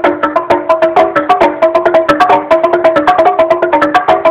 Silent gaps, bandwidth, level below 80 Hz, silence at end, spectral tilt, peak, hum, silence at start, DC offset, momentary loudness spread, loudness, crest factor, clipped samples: none; 10.5 kHz; -44 dBFS; 0 s; -5.5 dB/octave; 0 dBFS; none; 0 s; under 0.1%; 3 LU; -9 LUFS; 8 dB; 1%